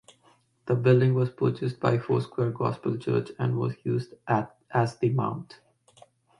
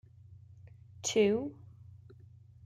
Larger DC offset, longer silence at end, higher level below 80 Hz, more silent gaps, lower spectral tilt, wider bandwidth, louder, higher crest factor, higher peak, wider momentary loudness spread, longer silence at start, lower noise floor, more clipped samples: neither; first, 0.95 s vs 0.7 s; first, -64 dBFS vs -70 dBFS; neither; first, -8.5 dB/octave vs -4 dB/octave; second, 10 kHz vs 13.5 kHz; first, -27 LUFS vs -31 LUFS; about the same, 20 dB vs 20 dB; first, -6 dBFS vs -16 dBFS; second, 9 LU vs 27 LU; second, 0.65 s vs 1 s; first, -63 dBFS vs -56 dBFS; neither